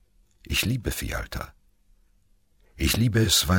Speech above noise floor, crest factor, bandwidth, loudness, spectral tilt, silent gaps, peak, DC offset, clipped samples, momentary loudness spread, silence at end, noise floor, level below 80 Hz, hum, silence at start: 40 dB; 20 dB; 17 kHz; -25 LUFS; -3.5 dB/octave; none; -8 dBFS; under 0.1%; under 0.1%; 16 LU; 0 s; -64 dBFS; -38 dBFS; none; 0.5 s